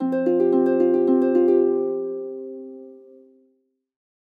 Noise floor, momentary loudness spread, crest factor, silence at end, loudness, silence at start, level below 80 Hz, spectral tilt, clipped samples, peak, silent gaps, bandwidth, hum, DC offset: -68 dBFS; 17 LU; 14 dB; 1.25 s; -20 LUFS; 0 s; under -90 dBFS; -9.5 dB/octave; under 0.1%; -8 dBFS; none; 3.8 kHz; none; under 0.1%